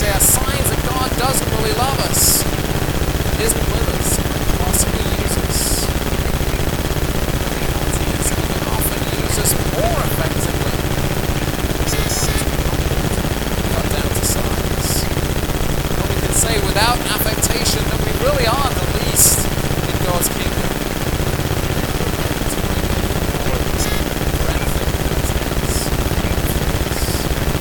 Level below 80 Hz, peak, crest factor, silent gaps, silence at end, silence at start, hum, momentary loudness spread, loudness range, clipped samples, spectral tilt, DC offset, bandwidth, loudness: -22 dBFS; 0 dBFS; 18 dB; none; 0 s; 0 s; none; 5 LU; 3 LU; under 0.1%; -4 dB/octave; 0.5%; 19.5 kHz; -18 LUFS